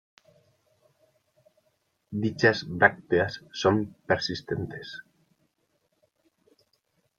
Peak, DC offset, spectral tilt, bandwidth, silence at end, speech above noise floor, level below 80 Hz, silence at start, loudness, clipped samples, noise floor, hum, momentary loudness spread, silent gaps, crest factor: -4 dBFS; under 0.1%; -5.5 dB/octave; 7.6 kHz; 2.2 s; 48 dB; -64 dBFS; 2.1 s; -26 LUFS; under 0.1%; -74 dBFS; none; 15 LU; none; 28 dB